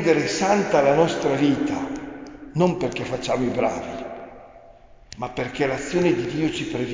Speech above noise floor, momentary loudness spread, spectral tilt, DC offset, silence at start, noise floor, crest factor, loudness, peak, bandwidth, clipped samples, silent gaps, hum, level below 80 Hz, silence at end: 26 dB; 15 LU; -5.5 dB/octave; under 0.1%; 0 s; -48 dBFS; 18 dB; -22 LUFS; -4 dBFS; 7.6 kHz; under 0.1%; none; none; -50 dBFS; 0 s